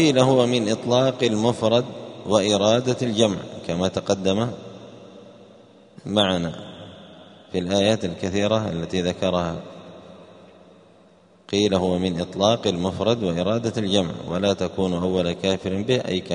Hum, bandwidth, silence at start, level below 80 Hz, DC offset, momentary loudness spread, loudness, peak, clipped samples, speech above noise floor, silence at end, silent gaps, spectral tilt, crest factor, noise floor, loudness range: none; 10.5 kHz; 0 s; -54 dBFS; under 0.1%; 15 LU; -22 LUFS; -2 dBFS; under 0.1%; 32 dB; 0 s; none; -5.5 dB/octave; 20 dB; -53 dBFS; 6 LU